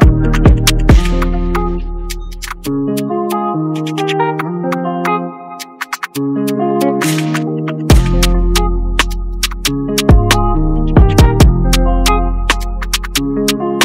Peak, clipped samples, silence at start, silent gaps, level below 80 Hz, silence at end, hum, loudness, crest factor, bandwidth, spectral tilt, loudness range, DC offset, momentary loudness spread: 0 dBFS; under 0.1%; 0 s; none; -16 dBFS; 0 s; none; -14 LUFS; 12 dB; 16.5 kHz; -5 dB/octave; 6 LU; under 0.1%; 11 LU